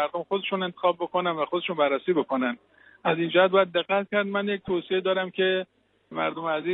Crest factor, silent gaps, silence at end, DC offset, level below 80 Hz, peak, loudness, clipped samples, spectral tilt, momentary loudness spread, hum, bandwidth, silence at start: 18 dB; none; 0 s; under 0.1%; -68 dBFS; -8 dBFS; -26 LUFS; under 0.1%; -9 dB/octave; 8 LU; none; 4.1 kHz; 0 s